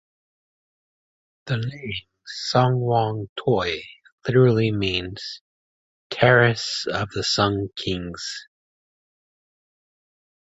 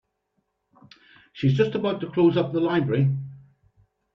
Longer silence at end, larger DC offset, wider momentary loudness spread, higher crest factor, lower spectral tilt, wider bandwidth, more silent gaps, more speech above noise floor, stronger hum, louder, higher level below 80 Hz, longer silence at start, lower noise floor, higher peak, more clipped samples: first, 2.05 s vs 0.75 s; neither; first, 16 LU vs 6 LU; about the same, 22 dB vs 18 dB; second, -5.5 dB/octave vs -9 dB/octave; first, 8 kHz vs 6.2 kHz; first, 3.29-3.36 s, 4.12-4.18 s, 5.41-6.10 s vs none; first, over 68 dB vs 53 dB; neither; about the same, -22 LUFS vs -23 LUFS; first, -50 dBFS vs -62 dBFS; about the same, 1.45 s vs 1.35 s; first, under -90 dBFS vs -75 dBFS; first, -2 dBFS vs -8 dBFS; neither